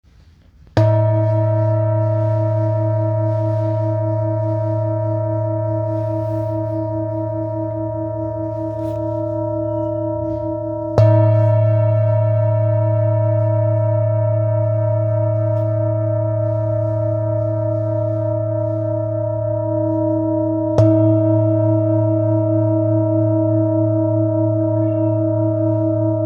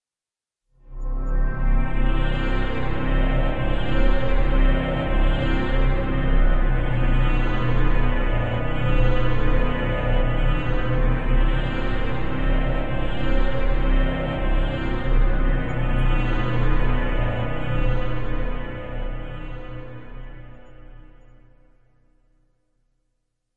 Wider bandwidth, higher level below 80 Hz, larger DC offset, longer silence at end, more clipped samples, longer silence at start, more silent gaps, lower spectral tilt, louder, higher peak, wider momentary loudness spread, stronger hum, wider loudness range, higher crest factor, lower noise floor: second, 2.9 kHz vs 4.2 kHz; second, -48 dBFS vs -22 dBFS; second, under 0.1% vs 2%; about the same, 0 s vs 0 s; neither; first, 0.75 s vs 0 s; neither; first, -11.5 dB/octave vs -8.5 dB/octave; first, -18 LUFS vs -25 LUFS; first, 0 dBFS vs -6 dBFS; second, 7 LU vs 10 LU; neither; about the same, 6 LU vs 8 LU; about the same, 16 dB vs 14 dB; second, -48 dBFS vs under -90 dBFS